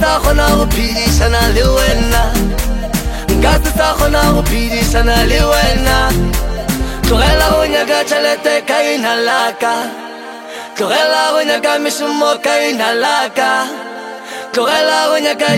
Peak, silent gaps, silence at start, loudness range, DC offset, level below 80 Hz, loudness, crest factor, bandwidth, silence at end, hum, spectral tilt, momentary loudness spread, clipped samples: 0 dBFS; none; 0 s; 2 LU; under 0.1%; -18 dBFS; -13 LUFS; 12 dB; 16.5 kHz; 0 s; none; -4 dB/octave; 8 LU; under 0.1%